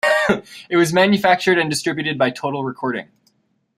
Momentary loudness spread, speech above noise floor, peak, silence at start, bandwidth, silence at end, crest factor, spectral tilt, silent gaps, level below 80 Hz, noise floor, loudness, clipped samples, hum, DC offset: 10 LU; 46 dB; -2 dBFS; 0.05 s; 15.5 kHz; 0.75 s; 18 dB; -4.5 dB/octave; none; -58 dBFS; -64 dBFS; -18 LUFS; under 0.1%; none; under 0.1%